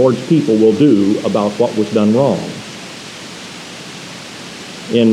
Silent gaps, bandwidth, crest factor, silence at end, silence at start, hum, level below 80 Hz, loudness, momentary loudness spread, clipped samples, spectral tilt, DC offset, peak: none; 13 kHz; 14 dB; 0 s; 0 s; none; -60 dBFS; -13 LUFS; 18 LU; under 0.1%; -6.5 dB/octave; under 0.1%; 0 dBFS